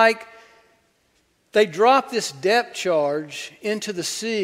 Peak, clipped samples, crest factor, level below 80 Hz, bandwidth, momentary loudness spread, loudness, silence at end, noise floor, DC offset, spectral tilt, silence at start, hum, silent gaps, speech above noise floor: -2 dBFS; under 0.1%; 20 dB; -70 dBFS; 16 kHz; 11 LU; -21 LUFS; 0 s; -65 dBFS; under 0.1%; -3 dB/octave; 0 s; none; none; 44 dB